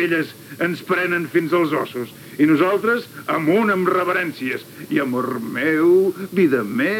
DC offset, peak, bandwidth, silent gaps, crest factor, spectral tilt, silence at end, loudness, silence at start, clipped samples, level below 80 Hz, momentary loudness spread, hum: under 0.1%; -6 dBFS; 17.5 kHz; none; 14 dB; -6.5 dB/octave; 0 s; -19 LUFS; 0 s; under 0.1%; -74 dBFS; 10 LU; none